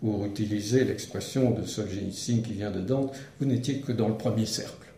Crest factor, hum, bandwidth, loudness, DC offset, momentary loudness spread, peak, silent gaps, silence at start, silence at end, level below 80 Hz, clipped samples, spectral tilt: 18 dB; none; 15.5 kHz; -29 LUFS; under 0.1%; 7 LU; -10 dBFS; none; 0 s; 0.05 s; -60 dBFS; under 0.1%; -6 dB/octave